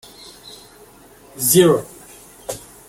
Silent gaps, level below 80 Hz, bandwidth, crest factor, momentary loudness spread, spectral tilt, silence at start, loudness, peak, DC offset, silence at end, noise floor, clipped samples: none; -54 dBFS; 16.5 kHz; 20 dB; 26 LU; -4 dB/octave; 1.35 s; -15 LUFS; -2 dBFS; under 0.1%; 0.3 s; -46 dBFS; under 0.1%